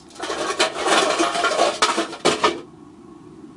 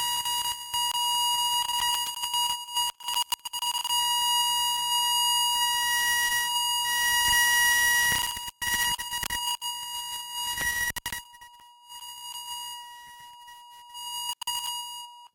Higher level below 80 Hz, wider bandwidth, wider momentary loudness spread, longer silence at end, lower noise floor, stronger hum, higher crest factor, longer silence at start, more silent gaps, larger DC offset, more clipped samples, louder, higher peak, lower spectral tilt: about the same, -60 dBFS vs -56 dBFS; second, 11.5 kHz vs 17 kHz; second, 8 LU vs 16 LU; about the same, 0 s vs 0.05 s; second, -43 dBFS vs -51 dBFS; neither; about the same, 18 dB vs 20 dB; about the same, 0.1 s vs 0 s; neither; neither; neither; first, -20 LUFS vs -25 LUFS; first, -4 dBFS vs -8 dBFS; first, -1.5 dB/octave vs 2.5 dB/octave